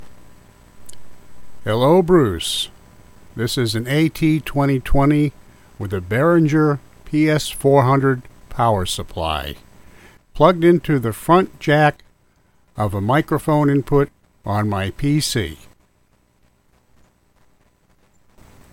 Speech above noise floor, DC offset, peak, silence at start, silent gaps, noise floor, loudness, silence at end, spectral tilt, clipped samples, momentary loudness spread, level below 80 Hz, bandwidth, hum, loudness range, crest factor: 42 dB; under 0.1%; 0 dBFS; 0 s; none; -59 dBFS; -18 LUFS; 3.2 s; -6 dB/octave; under 0.1%; 12 LU; -36 dBFS; 17 kHz; none; 5 LU; 18 dB